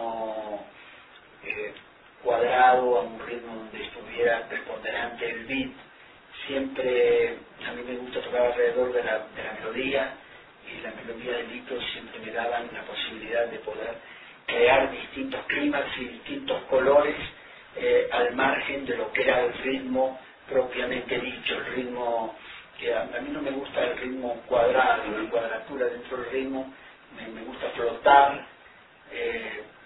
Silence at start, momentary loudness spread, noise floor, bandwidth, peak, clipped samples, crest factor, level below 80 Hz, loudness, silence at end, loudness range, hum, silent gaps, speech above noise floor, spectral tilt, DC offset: 0 s; 17 LU; -53 dBFS; 4.1 kHz; -4 dBFS; under 0.1%; 24 dB; -58 dBFS; -27 LUFS; 0 s; 6 LU; none; none; 26 dB; -7.5 dB/octave; under 0.1%